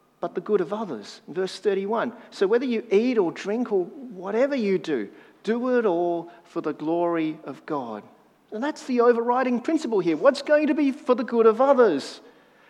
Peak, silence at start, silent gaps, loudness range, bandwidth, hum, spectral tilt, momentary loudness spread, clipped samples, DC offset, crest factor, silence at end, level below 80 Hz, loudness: -4 dBFS; 0.2 s; none; 6 LU; 11 kHz; none; -6 dB/octave; 15 LU; under 0.1%; under 0.1%; 20 dB; 0.5 s; -84 dBFS; -24 LUFS